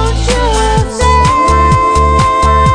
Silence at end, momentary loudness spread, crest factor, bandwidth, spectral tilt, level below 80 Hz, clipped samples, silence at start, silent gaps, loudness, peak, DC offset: 0 s; 4 LU; 8 dB; 10 kHz; -5 dB/octave; -14 dBFS; under 0.1%; 0 s; none; -10 LUFS; 0 dBFS; under 0.1%